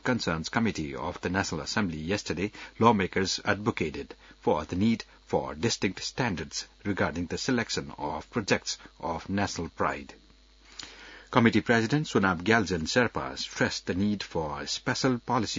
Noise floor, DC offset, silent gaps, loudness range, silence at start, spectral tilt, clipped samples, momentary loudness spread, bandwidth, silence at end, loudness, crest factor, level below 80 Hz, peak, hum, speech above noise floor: -57 dBFS; under 0.1%; none; 5 LU; 0.05 s; -4.5 dB/octave; under 0.1%; 11 LU; 7.8 kHz; 0 s; -29 LUFS; 24 dB; -54 dBFS; -6 dBFS; none; 28 dB